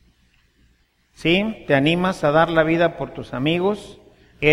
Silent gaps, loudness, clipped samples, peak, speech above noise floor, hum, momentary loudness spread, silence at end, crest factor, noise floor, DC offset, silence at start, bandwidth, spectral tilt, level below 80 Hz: none; -20 LUFS; under 0.1%; -2 dBFS; 42 dB; none; 9 LU; 0 s; 20 dB; -61 dBFS; under 0.1%; 1.2 s; 13.5 kHz; -6.5 dB/octave; -48 dBFS